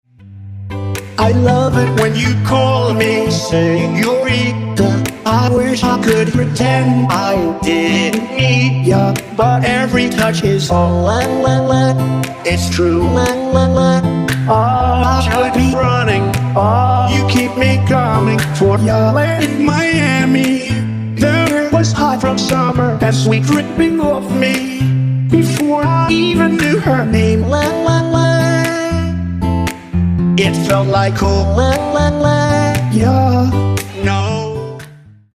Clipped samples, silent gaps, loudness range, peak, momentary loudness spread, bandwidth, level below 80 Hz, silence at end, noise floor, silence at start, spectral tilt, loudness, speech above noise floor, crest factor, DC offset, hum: under 0.1%; none; 1 LU; 0 dBFS; 5 LU; 15.5 kHz; -30 dBFS; 0.4 s; -38 dBFS; 0.2 s; -6 dB/octave; -13 LUFS; 26 dB; 12 dB; under 0.1%; none